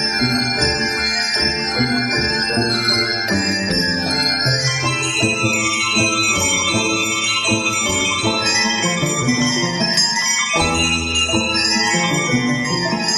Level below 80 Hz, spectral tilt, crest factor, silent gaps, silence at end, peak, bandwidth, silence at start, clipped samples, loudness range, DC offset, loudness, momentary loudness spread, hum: -40 dBFS; -2.5 dB/octave; 14 dB; none; 0 s; -2 dBFS; 16 kHz; 0 s; under 0.1%; 1 LU; under 0.1%; -16 LUFS; 3 LU; none